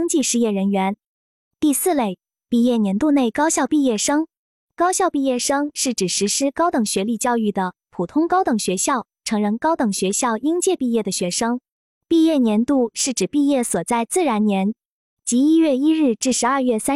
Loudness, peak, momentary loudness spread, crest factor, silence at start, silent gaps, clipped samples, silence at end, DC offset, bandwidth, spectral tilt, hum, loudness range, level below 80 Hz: -19 LUFS; -8 dBFS; 6 LU; 12 dB; 0 s; 1.06-1.51 s, 4.38-4.68 s, 11.72-12.01 s, 14.85-15.17 s; under 0.1%; 0 s; under 0.1%; 15 kHz; -4 dB/octave; none; 2 LU; -60 dBFS